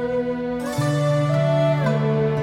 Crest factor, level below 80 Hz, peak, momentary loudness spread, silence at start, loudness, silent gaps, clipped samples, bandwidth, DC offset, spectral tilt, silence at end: 12 dB; -50 dBFS; -8 dBFS; 6 LU; 0 s; -21 LUFS; none; under 0.1%; 13.5 kHz; under 0.1%; -7.5 dB/octave; 0 s